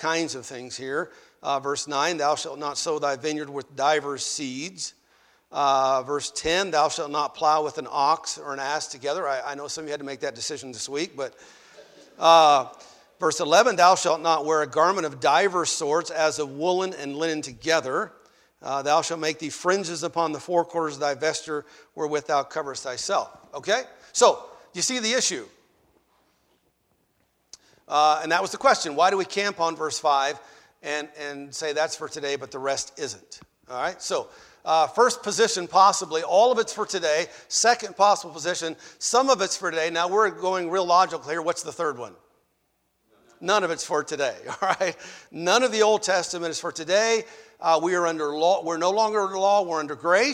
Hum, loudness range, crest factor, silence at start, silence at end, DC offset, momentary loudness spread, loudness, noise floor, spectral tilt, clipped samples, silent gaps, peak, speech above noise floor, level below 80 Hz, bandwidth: none; 7 LU; 22 dB; 0 s; 0 s; under 0.1%; 12 LU; -24 LUFS; -72 dBFS; -2 dB/octave; under 0.1%; none; -4 dBFS; 48 dB; -66 dBFS; 16 kHz